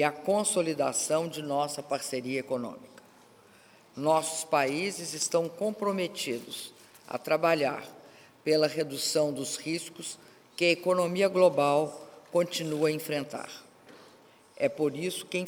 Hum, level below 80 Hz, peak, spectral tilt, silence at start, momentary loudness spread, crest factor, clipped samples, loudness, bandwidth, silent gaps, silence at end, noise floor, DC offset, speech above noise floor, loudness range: none; -78 dBFS; -10 dBFS; -3.5 dB/octave; 0 s; 14 LU; 20 dB; under 0.1%; -29 LUFS; over 20 kHz; none; 0 s; -58 dBFS; under 0.1%; 29 dB; 5 LU